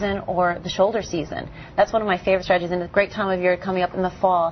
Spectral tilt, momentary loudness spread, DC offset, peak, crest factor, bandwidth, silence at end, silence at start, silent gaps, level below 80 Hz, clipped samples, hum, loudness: -5.5 dB/octave; 7 LU; under 0.1%; -4 dBFS; 18 dB; 6.4 kHz; 0 s; 0 s; none; -46 dBFS; under 0.1%; none; -22 LUFS